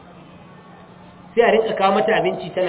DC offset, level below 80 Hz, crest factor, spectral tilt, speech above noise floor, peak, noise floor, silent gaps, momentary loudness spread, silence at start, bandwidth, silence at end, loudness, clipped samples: under 0.1%; -58 dBFS; 18 dB; -9 dB/octave; 26 dB; -2 dBFS; -43 dBFS; none; 6 LU; 0.15 s; 4 kHz; 0 s; -18 LUFS; under 0.1%